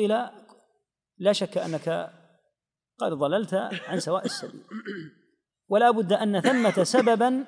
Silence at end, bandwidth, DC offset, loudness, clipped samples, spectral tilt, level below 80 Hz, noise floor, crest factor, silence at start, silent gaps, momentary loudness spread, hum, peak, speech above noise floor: 0 s; 10.5 kHz; under 0.1%; -25 LUFS; under 0.1%; -5 dB/octave; -82 dBFS; -83 dBFS; 20 dB; 0 s; none; 17 LU; none; -6 dBFS; 58 dB